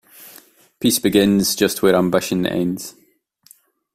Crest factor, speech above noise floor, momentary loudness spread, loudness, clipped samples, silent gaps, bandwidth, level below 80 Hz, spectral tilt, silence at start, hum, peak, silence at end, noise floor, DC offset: 18 dB; 40 dB; 9 LU; -17 LUFS; under 0.1%; none; 16 kHz; -52 dBFS; -4.5 dB/octave; 0.2 s; none; -2 dBFS; 1.05 s; -57 dBFS; under 0.1%